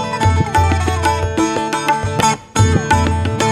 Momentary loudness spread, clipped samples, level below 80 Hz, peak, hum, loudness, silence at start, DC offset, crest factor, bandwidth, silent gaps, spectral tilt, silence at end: 3 LU; under 0.1%; -28 dBFS; 0 dBFS; none; -16 LUFS; 0 s; under 0.1%; 14 dB; 14 kHz; none; -5 dB/octave; 0 s